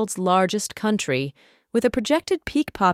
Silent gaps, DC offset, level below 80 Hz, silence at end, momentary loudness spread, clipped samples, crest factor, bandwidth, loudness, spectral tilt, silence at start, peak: none; under 0.1%; -50 dBFS; 0 s; 6 LU; under 0.1%; 18 dB; 16 kHz; -23 LUFS; -4.5 dB/octave; 0 s; -6 dBFS